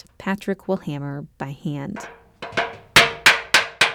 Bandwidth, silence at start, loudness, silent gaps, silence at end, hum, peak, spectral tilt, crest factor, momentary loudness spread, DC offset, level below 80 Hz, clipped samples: over 20 kHz; 0.2 s; -19 LUFS; none; 0 s; none; -4 dBFS; -2.5 dB/octave; 18 dB; 19 LU; under 0.1%; -52 dBFS; under 0.1%